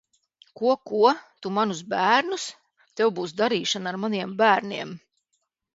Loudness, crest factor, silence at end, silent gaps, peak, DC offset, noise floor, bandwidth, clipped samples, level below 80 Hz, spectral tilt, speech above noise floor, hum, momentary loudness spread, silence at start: -24 LUFS; 20 dB; 0.75 s; none; -4 dBFS; under 0.1%; -76 dBFS; 8 kHz; under 0.1%; -74 dBFS; -4 dB/octave; 53 dB; none; 13 LU; 0.6 s